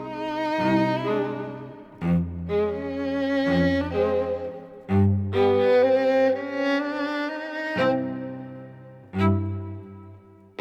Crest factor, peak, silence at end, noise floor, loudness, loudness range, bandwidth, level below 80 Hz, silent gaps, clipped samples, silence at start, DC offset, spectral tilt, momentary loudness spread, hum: 14 dB; -10 dBFS; 0.4 s; -48 dBFS; -24 LUFS; 5 LU; 8.2 kHz; -52 dBFS; none; under 0.1%; 0 s; under 0.1%; -8 dB/octave; 18 LU; 50 Hz at -45 dBFS